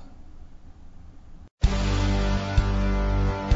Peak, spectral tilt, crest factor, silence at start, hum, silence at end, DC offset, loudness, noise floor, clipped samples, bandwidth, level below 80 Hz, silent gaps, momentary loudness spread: -8 dBFS; -6.5 dB/octave; 18 dB; 0 s; none; 0 s; under 0.1%; -26 LUFS; -43 dBFS; under 0.1%; 7.8 kHz; -28 dBFS; 1.51-1.58 s; 2 LU